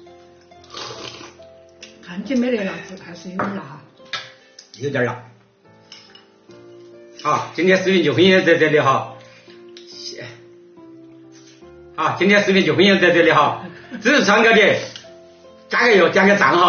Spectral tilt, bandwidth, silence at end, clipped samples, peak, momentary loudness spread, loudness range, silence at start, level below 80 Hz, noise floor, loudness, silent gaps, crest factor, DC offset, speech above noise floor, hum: -3 dB/octave; 6.8 kHz; 0 s; under 0.1%; -2 dBFS; 22 LU; 13 LU; 0.75 s; -62 dBFS; -51 dBFS; -16 LUFS; none; 16 dB; under 0.1%; 35 dB; none